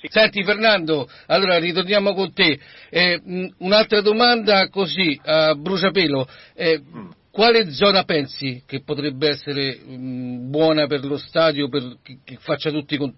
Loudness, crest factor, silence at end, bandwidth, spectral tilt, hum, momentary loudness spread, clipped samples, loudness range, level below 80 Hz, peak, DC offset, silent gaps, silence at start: -19 LUFS; 16 dB; 0.05 s; 5.8 kHz; -8.5 dB/octave; none; 13 LU; under 0.1%; 5 LU; -56 dBFS; -4 dBFS; under 0.1%; none; 0 s